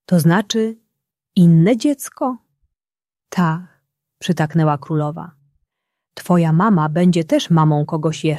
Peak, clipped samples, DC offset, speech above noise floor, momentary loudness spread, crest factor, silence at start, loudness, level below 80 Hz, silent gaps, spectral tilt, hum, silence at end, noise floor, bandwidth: -2 dBFS; under 0.1%; under 0.1%; over 74 dB; 12 LU; 16 dB; 0.1 s; -17 LUFS; -60 dBFS; none; -7 dB/octave; none; 0 s; under -90 dBFS; 13 kHz